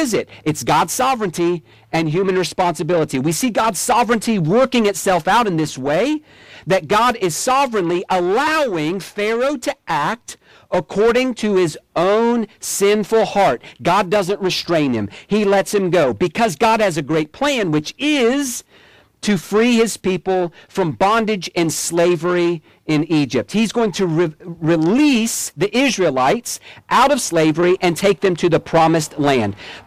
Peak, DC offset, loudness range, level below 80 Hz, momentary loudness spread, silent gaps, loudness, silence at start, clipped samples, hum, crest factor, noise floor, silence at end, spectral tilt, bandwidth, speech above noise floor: -6 dBFS; under 0.1%; 2 LU; -50 dBFS; 7 LU; none; -17 LUFS; 0 s; under 0.1%; none; 12 dB; -49 dBFS; 0.05 s; -4.5 dB/octave; 16.5 kHz; 32 dB